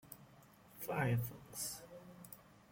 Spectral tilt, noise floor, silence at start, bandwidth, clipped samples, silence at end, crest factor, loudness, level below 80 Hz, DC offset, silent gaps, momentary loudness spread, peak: -5 dB/octave; -63 dBFS; 0.05 s; 17 kHz; under 0.1%; 0.1 s; 18 dB; -41 LUFS; -70 dBFS; under 0.1%; none; 22 LU; -26 dBFS